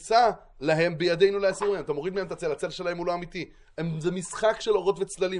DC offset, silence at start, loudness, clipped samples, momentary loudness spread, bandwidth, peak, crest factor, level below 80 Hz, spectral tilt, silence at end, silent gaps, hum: under 0.1%; 0 s; -27 LUFS; under 0.1%; 10 LU; 11.5 kHz; -8 dBFS; 18 dB; -56 dBFS; -5 dB/octave; 0 s; none; none